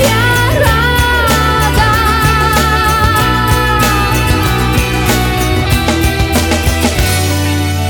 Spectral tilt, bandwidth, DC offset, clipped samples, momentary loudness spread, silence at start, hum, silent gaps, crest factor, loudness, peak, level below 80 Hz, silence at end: -4.5 dB/octave; over 20 kHz; under 0.1%; under 0.1%; 3 LU; 0 s; none; none; 10 dB; -11 LUFS; 0 dBFS; -18 dBFS; 0 s